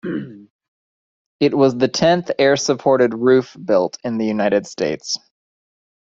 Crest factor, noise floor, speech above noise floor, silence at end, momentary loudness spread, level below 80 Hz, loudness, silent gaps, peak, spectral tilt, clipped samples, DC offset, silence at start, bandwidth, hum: 16 dB; under -90 dBFS; over 73 dB; 0.95 s; 10 LU; -58 dBFS; -18 LUFS; 0.50-0.59 s, 0.68-1.39 s; -2 dBFS; -5 dB/octave; under 0.1%; under 0.1%; 0.05 s; 7.8 kHz; none